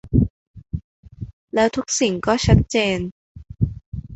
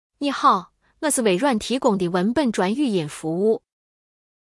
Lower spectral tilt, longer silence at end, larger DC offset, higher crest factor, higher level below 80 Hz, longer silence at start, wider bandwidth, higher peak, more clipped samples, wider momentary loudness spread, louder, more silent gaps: about the same, -5 dB/octave vs -4.5 dB/octave; second, 0 s vs 0.85 s; neither; about the same, 20 dB vs 18 dB; first, -32 dBFS vs -58 dBFS; second, 0.05 s vs 0.2 s; second, 8.2 kHz vs 12 kHz; about the same, -2 dBFS vs -4 dBFS; neither; first, 18 LU vs 7 LU; about the same, -20 LUFS vs -21 LUFS; first, 0.30-0.54 s, 0.84-1.03 s, 1.33-1.48 s, 3.11-3.35 s, 3.86-3.92 s vs none